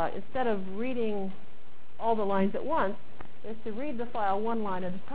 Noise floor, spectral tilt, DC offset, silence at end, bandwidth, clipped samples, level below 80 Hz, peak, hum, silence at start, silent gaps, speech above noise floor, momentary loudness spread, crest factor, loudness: -57 dBFS; -10 dB/octave; 4%; 0 s; 4 kHz; under 0.1%; -58 dBFS; -14 dBFS; none; 0 s; none; 26 dB; 14 LU; 16 dB; -32 LUFS